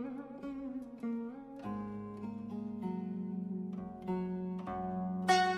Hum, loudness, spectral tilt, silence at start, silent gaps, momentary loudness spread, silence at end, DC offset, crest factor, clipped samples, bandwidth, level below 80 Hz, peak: none; -39 LUFS; -5.5 dB/octave; 0 s; none; 7 LU; 0 s; under 0.1%; 20 dB; under 0.1%; 12.5 kHz; -68 dBFS; -18 dBFS